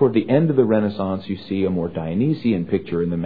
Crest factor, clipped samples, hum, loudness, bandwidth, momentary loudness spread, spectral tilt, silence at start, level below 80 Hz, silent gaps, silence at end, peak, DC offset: 16 dB; under 0.1%; none; -21 LUFS; 5 kHz; 8 LU; -11.5 dB/octave; 0 s; -52 dBFS; none; 0 s; -4 dBFS; 0.5%